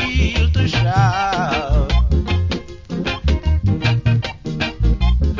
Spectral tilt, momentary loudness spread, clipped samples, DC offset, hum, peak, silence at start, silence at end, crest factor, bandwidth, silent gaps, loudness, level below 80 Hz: -6.5 dB/octave; 7 LU; under 0.1%; under 0.1%; none; -4 dBFS; 0 s; 0 s; 14 dB; 7.6 kHz; none; -18 LUFS; -20 dBFS